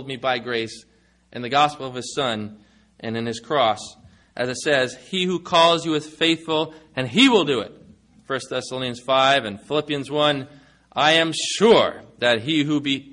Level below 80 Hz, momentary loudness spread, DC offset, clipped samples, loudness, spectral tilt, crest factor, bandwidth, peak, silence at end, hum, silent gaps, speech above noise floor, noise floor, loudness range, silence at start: -62 dBFS; 14 LU; under 0.1%; under 0.1%; -21 LUFS; -4 dB/octave; 18 dB; 11 kHz; -4 dBFS; 0.05 s; none; none; 30 dB; -51 dBFS; 5 LU; 0 s